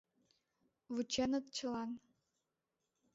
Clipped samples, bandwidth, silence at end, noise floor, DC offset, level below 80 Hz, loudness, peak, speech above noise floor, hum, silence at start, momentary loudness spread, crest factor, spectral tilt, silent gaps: under 0.1%; 7.6 kHz; 1.15 s; -89 dBFS; under 0.1%; -74 dBFS; -40 LUFS; -24 dBFS; 49 dB; none; 0.9 s; 10 LU; 18 dB; -3 dB/octave; none